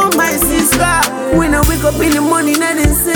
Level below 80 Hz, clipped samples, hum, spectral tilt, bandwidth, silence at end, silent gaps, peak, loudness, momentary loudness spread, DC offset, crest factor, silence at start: -22 dBFS; under 0.1%; none; -4 dB/octave; over 20 kHz; 0 s; none; 0 dBFS; -12 LUFS; 2 LU; under 0.1%; 12 dB; 0 s